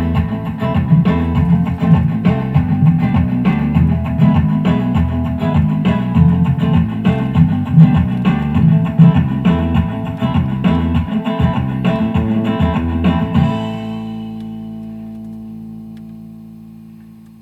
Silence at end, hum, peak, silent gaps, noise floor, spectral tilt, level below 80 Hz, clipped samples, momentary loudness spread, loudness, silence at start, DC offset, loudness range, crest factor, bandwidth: 0.3 s; none; 0 dBFS; none; -38 dBFS; -9.5 dB/octave; -28 dBFS; under 0.1%; 16 LU; -14 LUFS; 0 s; under 0.1%; 8 LU; 14 dB; 4.3 kHz